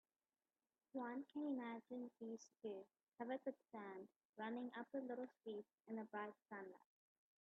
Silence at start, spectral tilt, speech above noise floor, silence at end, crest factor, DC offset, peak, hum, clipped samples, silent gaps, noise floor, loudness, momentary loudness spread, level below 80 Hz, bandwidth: 0.95 s; -4.5 dB/octave; over 38 dB; 0.65 s; 18 dB; under 0.1%; -36 dBFS; none; under 0.1%; 3.03-3.07 s, 4.25-4.33 s; under -90 dBFS; -52 LUFS; 8 LU; under -90 dBFS; 4.2 kHz